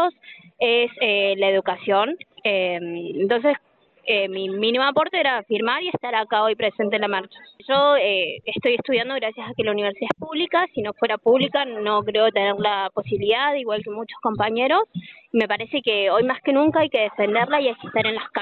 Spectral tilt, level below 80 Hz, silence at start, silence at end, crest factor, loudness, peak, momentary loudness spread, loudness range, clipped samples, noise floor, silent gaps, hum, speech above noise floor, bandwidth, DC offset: -7 dB/octave; -64 dBFS; 0 s; 0 s; 14 dB; -21 LUFS; -8 dBFS; 7 LU; 2 LU; under 0.1%; -47 dBFS; none; none; 25 dB; 4.6 kHz; under 0.1%